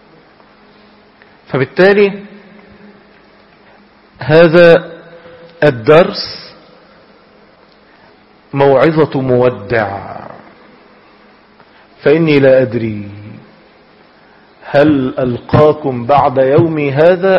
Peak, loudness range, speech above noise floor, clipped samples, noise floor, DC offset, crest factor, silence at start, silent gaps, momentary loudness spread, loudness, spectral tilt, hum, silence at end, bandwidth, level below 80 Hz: 0 dBFS; 5 LU; 35 dB; 0.2%; -45 dBFS; under 0.1%; 14 dB; 1.5 s; none; 17 LU; -11 LUFS; -8.5 dB/octave; none; 0 s; 6 kHz; -46 dBFS